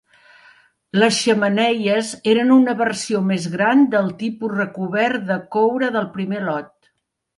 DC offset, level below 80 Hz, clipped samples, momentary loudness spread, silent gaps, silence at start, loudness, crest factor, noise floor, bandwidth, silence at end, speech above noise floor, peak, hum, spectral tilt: under 0.1%; -68 dBFS; under 0.1%; 9 LU; none; 0.95 s; -18 LUFS; 16 dB; -70 dBFS; 11.5 kHz; 0.7 s; 52 dB; -4 dBFS; none; -5 dB/octave